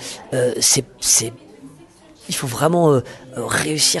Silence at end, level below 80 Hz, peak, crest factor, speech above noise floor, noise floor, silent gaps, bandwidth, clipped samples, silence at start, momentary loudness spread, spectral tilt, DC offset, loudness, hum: 0 s; -52 dBFS; -2 dBFS; 18 dB; 28 dB; -46 dBFS; none; 12.5 kHz; under 0.1%; 0 s; 11 LU; -3 dB/octave; under 0.1%; -17 LUFS; none